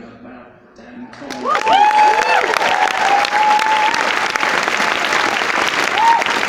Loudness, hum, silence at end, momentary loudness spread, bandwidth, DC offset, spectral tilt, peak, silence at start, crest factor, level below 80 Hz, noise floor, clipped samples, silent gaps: -14 LUFS; none; 0 s; 5 LU; 17 kHz; under 0.1%; -1 dB/octave; 0 dBFS; 0 s; 16 dB; -58 dBFS; -41 dBFS; under 0.1%; none